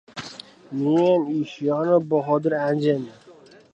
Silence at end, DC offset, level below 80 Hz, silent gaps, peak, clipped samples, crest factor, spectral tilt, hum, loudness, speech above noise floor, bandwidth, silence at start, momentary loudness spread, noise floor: 0.4 s; under 0.1%; -70 dBFS; none; -6 dBFS; under 0.1%; 16 dB; -7.5 dB/octave; none; -22 LUFS; 28 dB; 9.2 kHz; 0.15 s; 16 LU; -49 dBFS